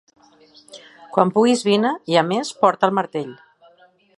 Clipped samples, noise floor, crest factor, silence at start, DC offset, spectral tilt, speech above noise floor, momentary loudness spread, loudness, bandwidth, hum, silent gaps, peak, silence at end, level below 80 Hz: under 0.1%; -54 dBFS; 20 dB; 0.75 s; under 0.1%; -5 dB/octave; 35 dB; 10 LU; -19 LUFS; 11.5 kHz; none; none; 0 dBFS; 0.85 s; -70 dBFS